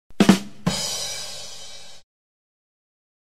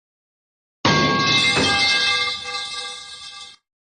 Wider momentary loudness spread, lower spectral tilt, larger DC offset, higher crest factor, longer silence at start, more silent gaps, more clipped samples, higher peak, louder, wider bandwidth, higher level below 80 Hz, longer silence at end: about the same, 21 LU vs 19 LU; first, -4 dB/octave vs -2.5 dB/octave; first, 1% vs under 0.1%; first, 26 dB vs 18 dB; second, 0.2 s vs 0.85 s; neither; neither; first, 0 dBFS vs -4 dBFS; second, -22 LUFS vs -18 LUFS; first, 15.5 kHz vs 11 kHz; about the same, -52 dBFS vs -54 dBFS; first, 1.3 s vs 0.4 s